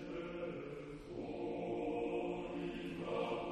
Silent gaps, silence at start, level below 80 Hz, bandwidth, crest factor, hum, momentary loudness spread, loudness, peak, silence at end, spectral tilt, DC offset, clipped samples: none; 0 s; -64 dBFS; 10 kHz; 14 dB; none; 7 LU; -43 LUFS; -28 dBFS; 0 s; -7 dB/octave; under 0.1%; under 0.1%